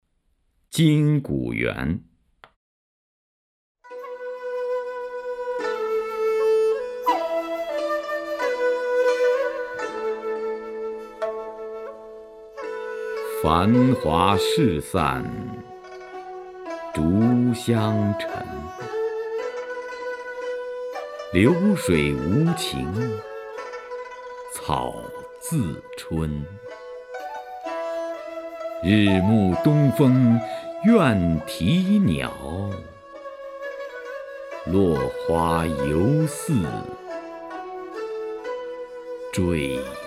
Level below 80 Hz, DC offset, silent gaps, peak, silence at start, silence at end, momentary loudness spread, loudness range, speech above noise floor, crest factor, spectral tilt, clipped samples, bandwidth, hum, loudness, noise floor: -46 dBFS; under 0.1%; 2.56-3.75 s; -2 dBFS; 0.7 s; 0 s; 17 LU; 10 LU; 47 dB; 22 dB; -6.5 dB/octave; under 0.1%; 15.5 kHz; none; -23 LUFS; -68 dBFS